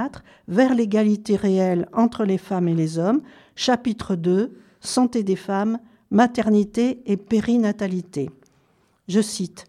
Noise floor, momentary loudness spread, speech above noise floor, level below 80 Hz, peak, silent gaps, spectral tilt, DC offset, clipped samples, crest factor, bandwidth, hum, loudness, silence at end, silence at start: -62 dBFS; 8 LU; 41 dB; -58 dBFS; -6 dBFS; none; -6 dB/octave; under 0.1%; under 0.1%; 16 dB; 12.5 kHz; none; -22 LUFS; 0.05 s; 0 s